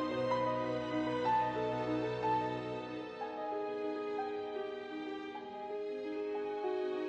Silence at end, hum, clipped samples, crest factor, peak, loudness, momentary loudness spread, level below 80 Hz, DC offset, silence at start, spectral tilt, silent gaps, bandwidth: 0 s; none; under 0.1%; 14 dB; -22 dBFS; -37 LUFS; 9 LU; -68 dBFS; under 0.1%; 0 s; -6.5 dB/octave; none; 8.8 kHz